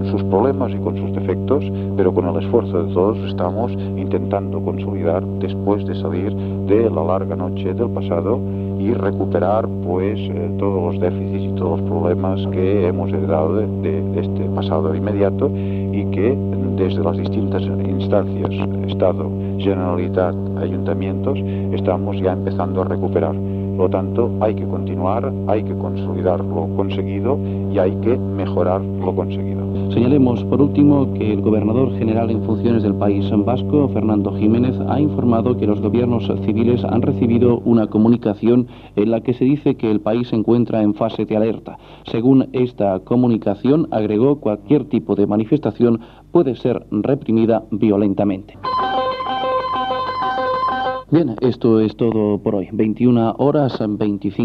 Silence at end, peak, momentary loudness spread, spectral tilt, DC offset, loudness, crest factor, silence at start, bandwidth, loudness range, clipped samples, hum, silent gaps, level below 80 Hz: 0 s; -2 dBFS; 6 LU; -10.5 dB/octave; under 0.1%; -18 LUFS; 16 dB; 0 s; 5.2 kHz; 3 LU; under 0.1%; none; none; -48 dBFS